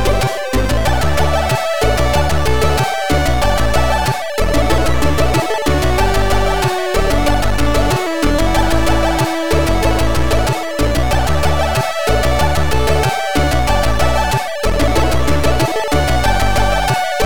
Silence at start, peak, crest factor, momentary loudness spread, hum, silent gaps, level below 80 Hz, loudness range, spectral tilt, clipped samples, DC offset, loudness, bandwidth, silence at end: 0 s; -4 dBFS; 12 dB; 2 LU; none; none; -20 dBFS; 0 LU; -5 dB/octave; under 0.1%; 9%; -15 LUFS; 19 kHz; 0 s